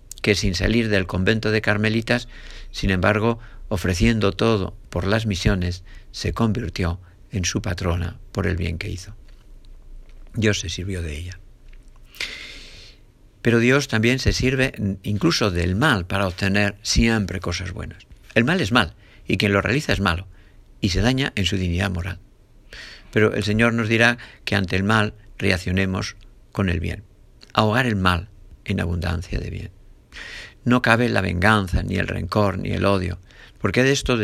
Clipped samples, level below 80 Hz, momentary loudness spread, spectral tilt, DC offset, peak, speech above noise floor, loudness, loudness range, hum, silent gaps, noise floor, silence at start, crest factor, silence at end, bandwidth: under 0.1%; -36 dBFS; 14 LU; -5 dB/octave; under 0.1%; 0 dBFS; 29 dB; -21 LUFS; 7 LU; none; none; -50 dBFS; 0.1 s; 22 dB; 0 s; 14.5 kHz